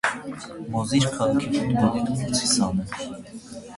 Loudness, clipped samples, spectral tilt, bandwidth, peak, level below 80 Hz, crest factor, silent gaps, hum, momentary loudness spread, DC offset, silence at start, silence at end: -24 LUFS; under 0.1%; -4.5 dB/octave; 11.5 kHz; -4 dBFS; -50 dBFS; 20 dB; none; none; 15 LU; under 0.1%; 0.05 s; 0 s